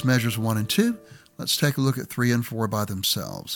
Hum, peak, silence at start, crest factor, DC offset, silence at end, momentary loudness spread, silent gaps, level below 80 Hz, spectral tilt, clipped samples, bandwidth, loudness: none; -6 dBFS; 0 s; 18 dB; under 0.1%; 0 s; 5 LU; none; -60 dBFS; -4.5 dB/octave; under 0.1%; 19 kHz; -24 LUFS